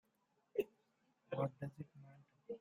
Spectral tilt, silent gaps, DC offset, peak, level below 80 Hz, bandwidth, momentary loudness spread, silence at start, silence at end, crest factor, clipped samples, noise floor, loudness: -8.5 dB/octave; none; under 0.1%; -26 dBFS; -82 dBFS; 14 kHz; 20 LU; 0.55 s; 0.05 s; 22 dB; under 0.1%; -81 dBFS; -46 LUFS